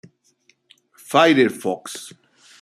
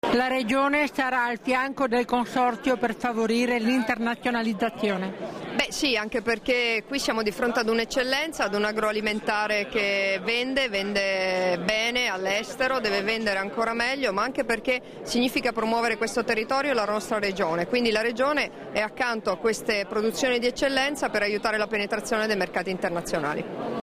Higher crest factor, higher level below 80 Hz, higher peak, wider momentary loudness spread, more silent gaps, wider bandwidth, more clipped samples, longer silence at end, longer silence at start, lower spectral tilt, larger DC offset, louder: first, 20 dB vs 14 dB; second, -70 dBFS vs -54 dBFS; first, -2 dBFS vs -10 dBFS; first, 20 LU vs 4 LU; neither; about the same, 15 kHz vs 15.5 kHz; neither; first, 0.55 s vs 0 s; first, 1.1 s vs 0.05 s; about the same, -4.5 dB/octave vs -3.5 dB/octave; neither; first, -18 LUFS vs -25 LUFS